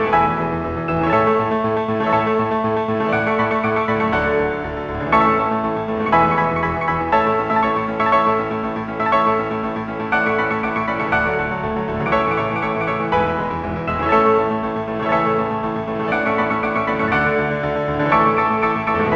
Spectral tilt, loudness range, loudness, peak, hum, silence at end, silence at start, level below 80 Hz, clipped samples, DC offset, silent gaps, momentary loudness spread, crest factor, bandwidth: -7.5 dB/octave; 2 LU; -18 LUFS; -2 dBFS; none; 0 s; 0 s; -42 dBFS; under 0.1%; under 0.1%; none; 7 LU; 18 dB; 7.6 kHz